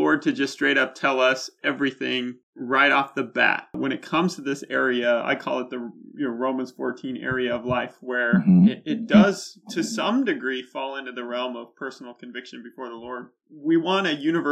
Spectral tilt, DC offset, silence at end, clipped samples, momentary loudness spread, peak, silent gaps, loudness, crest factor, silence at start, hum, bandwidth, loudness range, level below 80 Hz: -5.5 dB/octave; under 0.1%; 0 s; under 0.1%; 18 LU; -4 dBFS; 2.43-2.53 s; -23 LUFS; 18 dB; 0 s; none; 12 kHz; 7 LU; -62 dBFS